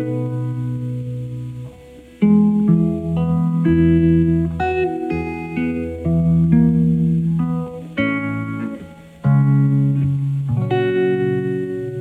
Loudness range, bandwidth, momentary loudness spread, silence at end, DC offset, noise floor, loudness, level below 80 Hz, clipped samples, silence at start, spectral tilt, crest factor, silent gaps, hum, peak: 3 LU; 4 kHz; 12 LU; 0 s; under 0.1%; -41 dBFS; -18 LUFS; -42 dBFS; under 0.1%; 0 s; -10 dB/octave; 16 dB; none; none; -2 dBFS